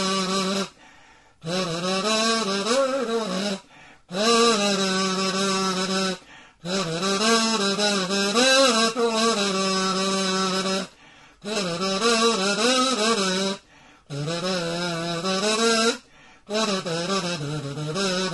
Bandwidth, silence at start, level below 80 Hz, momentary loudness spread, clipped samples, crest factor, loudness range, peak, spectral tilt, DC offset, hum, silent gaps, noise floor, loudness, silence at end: 11.5 kHz; 0 s; -64 dBFS; 10 LU; under 0.1%; 18 dB; 4 LU; -6 dBFS; -3 dB/octave; under 0.1%; none; none; -53 dBFS; -22 LUFS; 0 s